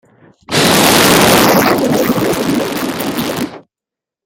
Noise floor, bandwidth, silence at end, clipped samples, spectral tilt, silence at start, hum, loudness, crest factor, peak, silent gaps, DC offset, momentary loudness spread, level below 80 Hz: -86 dBFS; over 20 kHz; 0.65 s; under 0.1%; -3.5 dB/octave; 0.5 s; none; -11 LUFS; 12 dB; 0 dBFS; none; under 0.1%; 11 LU; -42 dBFS